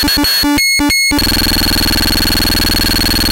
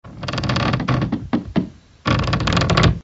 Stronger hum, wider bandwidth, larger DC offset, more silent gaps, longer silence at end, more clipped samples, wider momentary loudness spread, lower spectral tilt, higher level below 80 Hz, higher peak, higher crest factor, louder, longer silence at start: neither; first, 17.5 kHz vs 8 kHz; neither; neither; about the same, 0 s vs 0 s; neither; second, 1 LU vs 9 LU; second, -2.5 dB/octave vs -6 dB/octave; first, -22 dBFS vs -32 dBFS; about the same, 0 dBFS vs 0 dBFS; second, 12 dB vs 20 dB; first, -10 LUFS vs -20 LUFS; about the same, 0 s vs 0.05 s